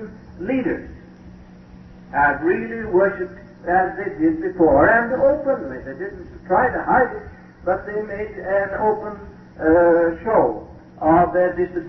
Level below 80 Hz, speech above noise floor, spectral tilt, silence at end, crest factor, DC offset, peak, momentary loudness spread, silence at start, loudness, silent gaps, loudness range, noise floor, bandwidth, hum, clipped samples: -44 dBFS; 23 dB; -10 dB/octave; 0 s; 16 dB; under 0.1%; -4 dBFS; 16 LU; 0 s; -19 LUFS; none; 4 LU; -42 dBFS; 5.8 kHz; none; under 0.1%